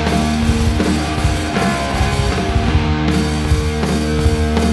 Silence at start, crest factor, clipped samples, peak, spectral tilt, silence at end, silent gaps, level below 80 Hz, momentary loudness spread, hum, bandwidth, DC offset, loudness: 0 s; 14 dB; under 0.1%; -2 dBFS; -5.5 dB/octave; 0 s; none; -20 dBFS; 2 LU; none; 12.5 kHz; under 0.1%; -17 LUFS